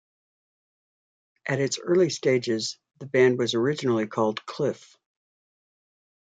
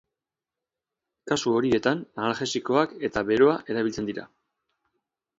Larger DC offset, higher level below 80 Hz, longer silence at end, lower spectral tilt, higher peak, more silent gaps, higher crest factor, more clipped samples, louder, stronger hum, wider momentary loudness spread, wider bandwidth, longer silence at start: neither; second, -74 dBFS vs -60 dBFS; first, 1.6 s vs 1.1 s; about the same, -5 dB/octave vs -5 dB/octave; about the same, -8 dBFS vs -6 dBFS; neither; about the same, 20 dB vs 20 dB; neither; about the same, -25 LUFS vs -25 LUFS; neither; about the same, 10 LU vs 8 LU; first, 9.2 kHz vs 7.8 kHz; first, 1.45 s vs 1.25 s